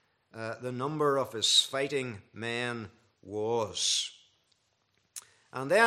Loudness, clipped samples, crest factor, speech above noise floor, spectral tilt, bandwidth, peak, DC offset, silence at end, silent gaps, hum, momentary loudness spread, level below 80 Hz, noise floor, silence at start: -30 LUFS; under 0.1%; 24 dB; 44 dB; -2 dB/octave; 14.5 kHz; -8 dBFS; under 0.1%; 0 s; none; none; 21 LU; -78 dBFS; -74 dBFS; 0.35 s